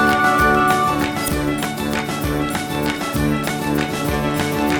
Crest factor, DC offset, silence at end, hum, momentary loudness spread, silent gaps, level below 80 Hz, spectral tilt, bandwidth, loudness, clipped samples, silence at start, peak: 16 dB; under 0.1%; 0 s; none; 7 LU; none; -34 dBFS; -4.5 dB/octave; over 20 kHz; -19 LUFS; under 0.1%; 0 s; -4 dBFS